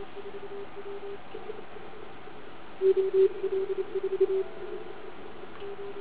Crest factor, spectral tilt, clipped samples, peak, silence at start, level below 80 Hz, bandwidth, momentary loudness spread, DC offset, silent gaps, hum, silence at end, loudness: 18 dB; -5 dB/octave; under 0.1%; -14 dBFS; 0 s; -64 dBFS; 4 kHz; 20 LU; 1%; none; none; 0 s; -31 LUFS